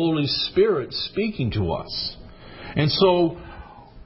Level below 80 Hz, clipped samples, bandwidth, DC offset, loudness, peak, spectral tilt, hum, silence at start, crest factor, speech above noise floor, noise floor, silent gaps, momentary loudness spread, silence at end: -44 dBFS; under 0.1%; 5.8 kHz; under 0.1%; -22 LUFS; -6 dBFS; -9.5 dB/octave; none; 0 s; 16 dB; 20 dB; -42 dBFS; none; 21 LU; 0 s